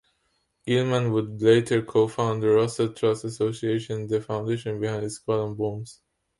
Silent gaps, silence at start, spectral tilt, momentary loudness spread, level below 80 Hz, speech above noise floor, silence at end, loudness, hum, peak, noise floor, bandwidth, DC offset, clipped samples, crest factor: none; 0.65 s; -6.5 dB/octave; 9 LU; -60 dBFS; 48 dB; 0.45 s; -25 LUFS; none; -6 dBFS; -72 dBFS; 11.5 kHz; under 0.1%; under 0.1%; 18 dB